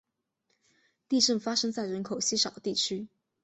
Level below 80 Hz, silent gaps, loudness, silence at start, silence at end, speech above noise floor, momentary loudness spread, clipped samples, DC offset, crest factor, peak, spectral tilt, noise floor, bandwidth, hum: -74 dBFS; none; -28 LUFS; 1.1 s; 0.4 s; 49 dB; 9 LU; under 0.1%; under 0.1%; 20 dB; -12 dBFS; -2.5 dB/octave; -78 dBFS; 8.4 kHz; none